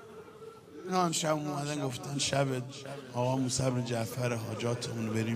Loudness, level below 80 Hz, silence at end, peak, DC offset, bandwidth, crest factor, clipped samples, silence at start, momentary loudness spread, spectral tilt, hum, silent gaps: -32 LUFS; -66 dBFS; 0 s; -14 dBFS; under 0.1%; 15.5 kHz; 18 dB; under 0.1%; 0 s; 17 LU; -4.5 dB/octave; none; none